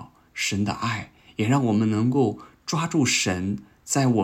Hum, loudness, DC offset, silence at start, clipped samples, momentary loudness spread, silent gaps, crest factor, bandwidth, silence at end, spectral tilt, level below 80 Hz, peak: none; -24 LUFS; under 0.1%; 0 s; under 0.1%; 12 LU; none; 14 dB; 16 kHz; 0 s; -4.5 dB/octave; -60 dBFS; -10 dBFS